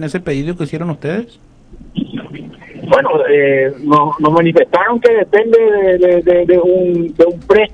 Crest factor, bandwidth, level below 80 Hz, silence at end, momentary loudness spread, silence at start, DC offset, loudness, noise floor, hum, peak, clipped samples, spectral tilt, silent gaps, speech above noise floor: 12 dB; 9.6 kHz; -42 dBFS; 0.05 s; 14 LU; 0 s; under 0.1%; -12 LUFS; -31 dBFS; none; 0 dBFS; 0.4%; -7.5 dB/octave; none; 20 dB